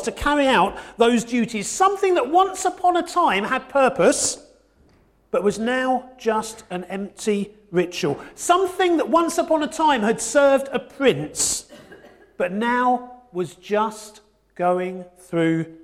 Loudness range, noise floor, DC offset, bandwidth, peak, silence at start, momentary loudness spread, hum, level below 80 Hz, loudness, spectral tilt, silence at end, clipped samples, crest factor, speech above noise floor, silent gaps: 5 LU; -57 dBFS; under 0.1%; 16 kHz; -4 dBFS; 0 s; 10 LU; none; -50 dBFS; -21 LUFS; -3.5 dB/octave; 0.05 s; under 0.1%; 18 dB; 37 dB; none